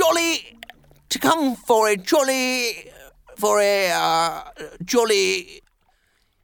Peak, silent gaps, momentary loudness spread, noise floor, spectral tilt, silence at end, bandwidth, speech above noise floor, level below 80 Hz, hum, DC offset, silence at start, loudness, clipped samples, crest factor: -4 dBFS; none; 12 LU; -64 dBFS; -2 dB/octave; 0.85 s; 19 kHz; 44 dB; -58 dBFS; none; under 0.1%; 0 s; -20 LUFS; under 0.1%; 18 dB